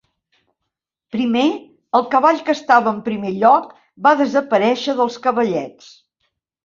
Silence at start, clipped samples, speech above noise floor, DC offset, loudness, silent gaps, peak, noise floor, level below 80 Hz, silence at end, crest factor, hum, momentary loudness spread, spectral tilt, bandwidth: 1.15 s; under 0.1%; 63 dB; under 0.1%; -17 LUFS; none; -2 dBFS; -80 dBFS; -64 dBFS; 0.95 s; 16 dB; none; 9 LU; -5.5 dB/octave; 7.6 kHz